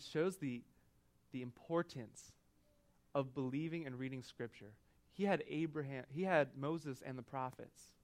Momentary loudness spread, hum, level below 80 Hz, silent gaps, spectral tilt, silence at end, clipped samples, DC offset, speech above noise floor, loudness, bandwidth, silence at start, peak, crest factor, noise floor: 19 LU; none; -78 dBFS; none; -6.5 dB/octave; 0.2 s; under 0.1%; under 0.1%; 31 dB; -42 LUFS; 16 kHz; 0 s; -20 dBFS; 24 dB; -73 dBFS